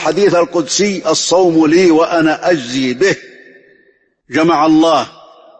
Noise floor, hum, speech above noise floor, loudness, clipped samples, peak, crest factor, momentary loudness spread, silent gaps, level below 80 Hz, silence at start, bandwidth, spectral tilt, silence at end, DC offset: -54 dBFS; none; 42 dB; -12 LUFS; under 0.1%; -2 dBFS; 12 dB; 6 LU; none; -54 dBFS; 0 s; 8.8 kHz; -4 dB/octave; 0.5 s; under 0.1%